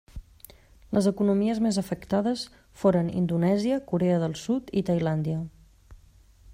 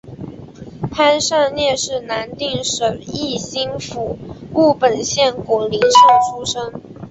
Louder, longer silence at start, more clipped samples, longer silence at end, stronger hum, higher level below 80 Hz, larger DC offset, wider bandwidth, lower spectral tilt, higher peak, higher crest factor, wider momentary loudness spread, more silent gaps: second, -26 LUFS vs -16 LUFS; about the same, 0.15 s vs 0.05 s; neither; about the same, 0 s vs 0 s; neither; about the same, -52 dBFS vs -48 dBFS; neither; first, 15.5 kHz vs 8.4 kHz; first, -7 dB/octave vs -3 dB/octave; second, -10 dBFS vs -2 dBFS; about the same, 16 dB vs 16 dB; second, 8 LU vs 18 LU; neither